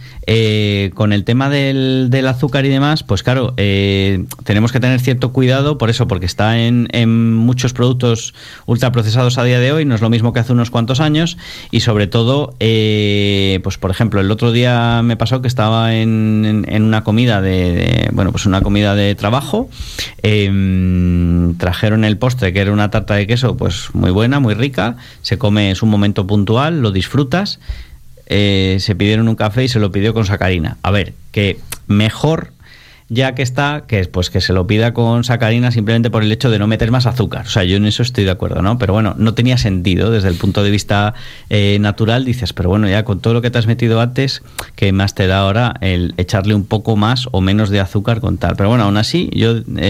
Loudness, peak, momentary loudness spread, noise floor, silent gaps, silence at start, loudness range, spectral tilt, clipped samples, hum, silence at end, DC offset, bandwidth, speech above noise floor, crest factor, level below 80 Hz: -14 LUFS; 0 dBFS; 4 LU; -41 dBFS; none; 0 s; 2 LU; -6.5 dB/octave; under 0.1%; none; 0 s; under 0.1%; 15 kHz; 28 dB; 12 dB; -34 dBFS